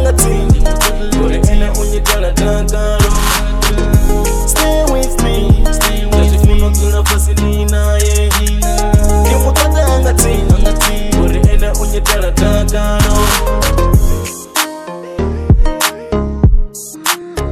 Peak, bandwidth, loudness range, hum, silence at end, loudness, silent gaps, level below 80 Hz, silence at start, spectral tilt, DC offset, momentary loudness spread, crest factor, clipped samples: 0 dBFS; 16 kHz; 2 LU; none; 0 s; -13 LUFS; none; -12 dBFS; 0 s; -4.5 dB/octave; under 0.1%; 5 LU; 10 dB; 0.5%